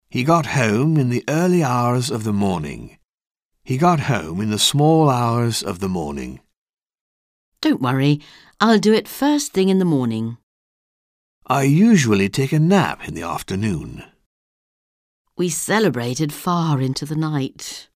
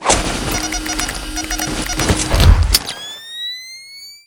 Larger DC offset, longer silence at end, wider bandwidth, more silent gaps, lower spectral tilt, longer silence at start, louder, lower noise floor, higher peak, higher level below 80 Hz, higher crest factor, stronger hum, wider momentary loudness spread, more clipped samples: neither; about the same, 0.15 s vs 0.1 s; second, 16 kHz vs 19 kHz; first, 3.09-3.18 s, 3.31-3.35 s, 3.45-3.49 s, 6.57-6.77 s, 7.01-7.52 s, 10.43-11.41 s, 14.26-15.25 s vs none; first, -5.5 dB/octave vs -3.5 dB/octave; first, 0.15 s vs 0 s; about the same, -19 LUFS vs -17 LUFS; first, under -90 dBFS vs -37 dBFS; about the same, -2 dBFS vs 0 dBFS; second, -50 dBFS vs -20 dBFS; about the same, 18 dB vs 18 dB; neither; second, 12 LU vs 15 LU; second, under 0.1% vs 0.2%